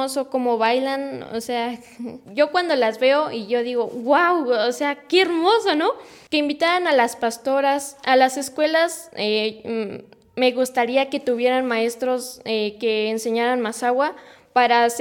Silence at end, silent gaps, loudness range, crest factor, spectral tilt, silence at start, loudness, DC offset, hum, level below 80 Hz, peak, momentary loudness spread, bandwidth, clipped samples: 0 s; none; 3 LU; 16 dB; -3 dB/octave; 0 s; -21 LUFS; under 0.1%; none; -70 dBFS; -4 dBFS; 10 LU; 18 kHz; under 0.1%